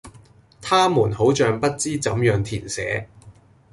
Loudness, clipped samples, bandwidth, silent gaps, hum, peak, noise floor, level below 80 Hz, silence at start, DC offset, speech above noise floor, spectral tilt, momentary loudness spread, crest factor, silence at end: -21 LUFS; under 0.1%; 11.5 kHz; none; none; -6 dBFS; -50 dBFS; -48 dBFS; 0.05 s; under 0.1%; 30 dB; -5 dB/octave; 9 LU; 16 dB; 0.4 s